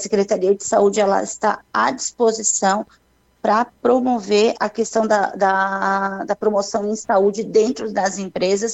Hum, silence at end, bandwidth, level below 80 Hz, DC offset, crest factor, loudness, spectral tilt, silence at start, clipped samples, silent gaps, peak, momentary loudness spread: none; 0 s; 8.4 kHz; -60 dBFS; under 0.1%; 14 dB; -19 LUFS; -3.5 dB/octave; 0 s; under 0.1%; none; -4 dBFS; 5 LU